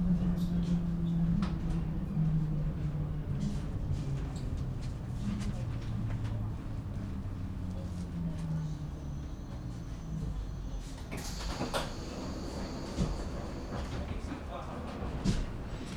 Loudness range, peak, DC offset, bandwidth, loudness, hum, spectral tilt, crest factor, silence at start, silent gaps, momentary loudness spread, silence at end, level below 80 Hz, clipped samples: 6 LU; -18 dBFS; under 0.1%; 13.5 kHz; -37 LUFS; none; -7 dB/octave; 18 dB; 0 s; none; 9 LU; 0 s; -40 dBFS; under 0.1%